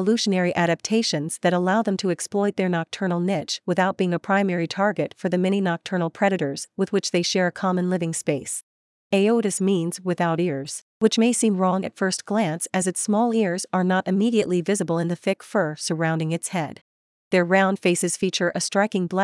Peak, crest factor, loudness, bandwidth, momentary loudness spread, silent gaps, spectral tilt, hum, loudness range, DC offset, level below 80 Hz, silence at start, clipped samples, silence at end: -4 dBFS; 18 dB; -23 LUFS; 12 kHz; 6 LU; 8.63-9.10 s, 10.82-11.00 s, 16.81-17.31 s; -5 dB/octave; none; 2 LU; under 0.1%; -72 dBFS; 0 s; under 0.1%; 0 s